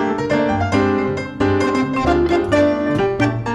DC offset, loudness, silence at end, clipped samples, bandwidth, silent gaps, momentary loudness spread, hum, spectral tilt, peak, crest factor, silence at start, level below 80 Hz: under 0.1%; -17 LUFS; 0 s; under 0.1%; 10.5 kHz; none; 3 LU; none; -7 dB/octave; -4 dBFS; 12 dB; 0 s; -36 dBFS